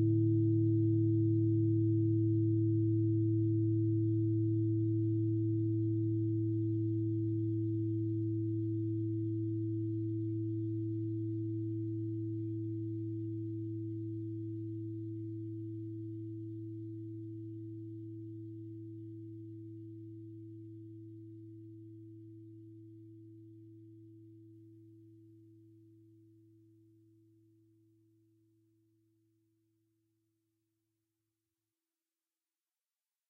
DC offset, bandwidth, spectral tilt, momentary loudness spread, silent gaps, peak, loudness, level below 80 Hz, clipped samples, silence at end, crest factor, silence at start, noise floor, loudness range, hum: under 0.1%; 0.7 kHz; -16 dB/octave; 21 LU; none; -22 dBFS; -35 LUFS; -70 dBFS; under 0.1%; 7.9 s; 14 dB; 0 s; under -90 dBFS; 21 LU; none